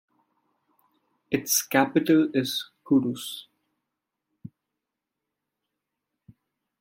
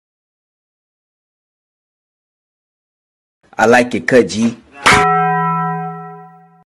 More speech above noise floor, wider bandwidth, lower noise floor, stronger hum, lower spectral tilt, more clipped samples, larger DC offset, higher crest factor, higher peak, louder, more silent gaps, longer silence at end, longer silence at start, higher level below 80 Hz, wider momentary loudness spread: first, 62 dB vs 27 dB; first, 16.5 kHz vs 14.5 kHz; first, -85 dBFS vs -39 dBFS; neither; about the same, -3.5 dB/octave vs -4.5 dB/octave; neither; neither; first, 24 dB vs 18 dB; second, -4 dBFS vs 0 dBFS; second, -24 LUFS vs -13 LUFS; neither; first, 2.35 s vs 0.4 s; second, 1.3 s vs 3.6 s; second, -72 dBFS vs -46 dBFS; second, 13 LU vs 18 LU